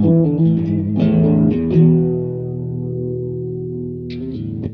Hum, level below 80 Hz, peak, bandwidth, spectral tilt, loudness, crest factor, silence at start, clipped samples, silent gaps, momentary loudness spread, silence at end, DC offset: none; -42 dBFS; -2 dBFS; 4.6 kHz; -12 dB/octave; -18 LUFS; 14 dB; 0 s; under 0.1%; none; 12 LU; 0 s; under 0.1%